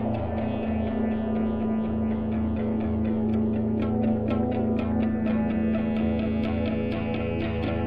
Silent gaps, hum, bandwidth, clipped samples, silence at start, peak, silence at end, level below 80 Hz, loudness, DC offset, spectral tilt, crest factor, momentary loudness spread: none; none; 4.8 kHz; under 0.1%; 0 s; -14 dBFS; 0 s; -40 dBFS; -26 LUFS; 0.6%; -10.5 dB/octave; 12 dB; 3 LU